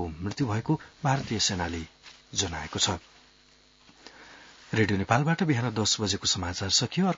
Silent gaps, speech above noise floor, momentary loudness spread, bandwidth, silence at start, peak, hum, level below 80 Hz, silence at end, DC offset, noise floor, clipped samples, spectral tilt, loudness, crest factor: none; 32 dB; 9 LU; 7.8 kHz; 0 s; -6 dBFS; none; -56 dBFS; 0 s; under 0.1%; -59 dBFS; under 0.1%; -3.5 dB/octave; -27 LUFS; 22 dB